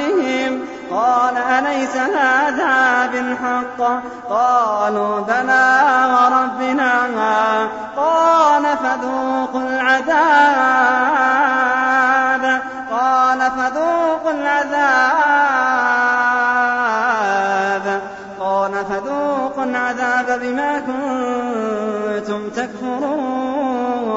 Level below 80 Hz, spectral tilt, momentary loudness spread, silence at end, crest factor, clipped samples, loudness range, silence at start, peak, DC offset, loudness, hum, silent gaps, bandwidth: -58 dBFS; -3.5 dB/octave; 8 LU; 0 s; 14 dB; under 0.1%; 6 LU; 0 s; -2 dBFS; under 0.1%; -16 LUFS; none; none; 8 kHz